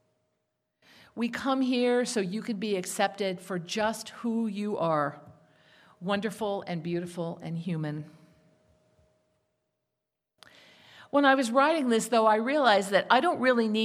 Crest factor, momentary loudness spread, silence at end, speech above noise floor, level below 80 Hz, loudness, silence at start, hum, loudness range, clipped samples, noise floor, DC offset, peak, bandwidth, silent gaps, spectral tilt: 22 dB; 12 LU; 0 s; 58 dB; -76 dBFS; -27 LUFS; 1.15 s; none; 13 LU; under 0.1%; -86 dBFS; under 0.1%; -8 dBFS; 15.5 kHz; none; -4.5 dB/octave